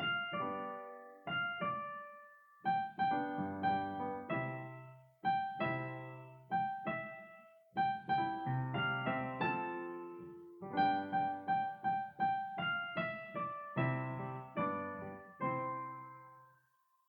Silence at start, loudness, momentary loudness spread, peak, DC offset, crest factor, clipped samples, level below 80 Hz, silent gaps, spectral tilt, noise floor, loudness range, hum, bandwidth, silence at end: 0 s; -39 LUFS; 14 LU; -20 dBFS; under 0.1%; 18 dB; under 0.1%; -76 dBFS; none; -8.5 dB/octave; -75 dBFS; 3 LU; none; 18 kHz; 0.65 s